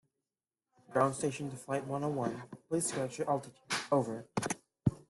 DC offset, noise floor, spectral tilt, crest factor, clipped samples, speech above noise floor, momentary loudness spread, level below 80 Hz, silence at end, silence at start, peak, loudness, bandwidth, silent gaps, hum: under 0.1%; under -90 dBFS; -5 dB/octave; 22 dB; under 0.1%; over 55 dB; 7 LU; -66 dBFS; 0.1 s; 0.9 s; -14 dBFS; -35 LUFS; 12.5 kHz; none; none